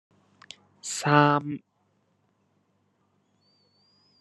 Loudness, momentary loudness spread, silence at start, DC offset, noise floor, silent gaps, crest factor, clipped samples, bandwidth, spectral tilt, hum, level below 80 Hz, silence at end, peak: -24 LUFS; 19 LU; 0.85 s; under 0.1%; -70 dBFS; none; 28 dB; under 0.1%; 11.5 kHz; -5 dB/octave; none; -76 dBFS; 2.6 s; -2 dBFS